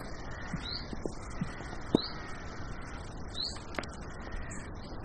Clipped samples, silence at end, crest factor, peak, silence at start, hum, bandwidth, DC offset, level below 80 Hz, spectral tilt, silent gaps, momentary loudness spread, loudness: under 0.1%; 0 s; 30 dB; -8 dBFS; 0 s; none; 9.4 kHz; under 0.1%; -46 dBFS; -5 dB/octave; none; 11 LU; -39 LUFS